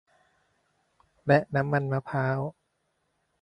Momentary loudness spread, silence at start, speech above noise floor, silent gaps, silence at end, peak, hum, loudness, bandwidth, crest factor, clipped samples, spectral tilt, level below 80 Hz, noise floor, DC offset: 11 LU; 1.25 s; 50 dB; none; 0.9 s; -8 dBFS; none; -27 LUFS; 9.2 kHz; 22 dB; under 0.1%; -9 dB/octave; -64 dBFS; -76 dBFS; under 0.1%